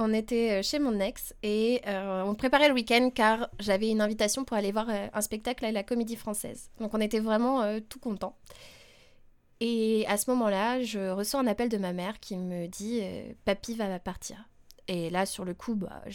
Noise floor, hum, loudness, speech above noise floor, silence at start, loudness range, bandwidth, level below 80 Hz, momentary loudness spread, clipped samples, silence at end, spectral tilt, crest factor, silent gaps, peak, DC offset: -58 dBFS; none; -29 LUFS; 29 dB; 0 s; 7 LU; 18 kHz; -54 dBFS; 11 LU; under 0.1%; 0 s; -4 dB/octave; 20 dB; none; -10 dBFS; under 0.1%